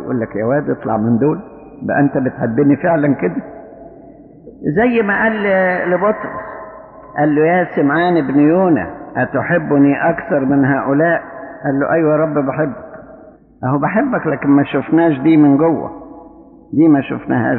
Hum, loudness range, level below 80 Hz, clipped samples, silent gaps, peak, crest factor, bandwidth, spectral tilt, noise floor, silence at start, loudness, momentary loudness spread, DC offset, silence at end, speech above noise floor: none; 3 LU; -50 dBFS; under 0.1%; none; -2 dBFS; 12 dB; 4.2 kHz; -7 dB/octave; -41 dBFS; 0 s; -15 LUFS; 13 LU; under 0.1%; 0 s; 27 dB